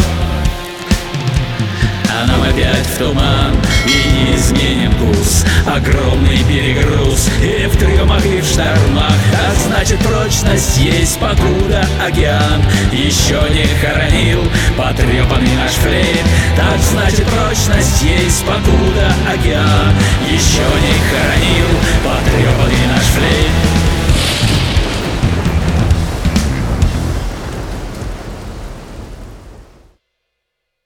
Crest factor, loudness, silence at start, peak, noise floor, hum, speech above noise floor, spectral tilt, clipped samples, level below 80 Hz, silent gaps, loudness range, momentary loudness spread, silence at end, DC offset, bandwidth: 12 dB; -12 LUFS; 0 s; 0 dBFS; -73 dBFS; none; 62 dB; -4.5 dB/octave; under 0.1%; -18 dBFS; none; 5 LU; 6 LU; 1.25 s; under 0.1%; 17.5 kHz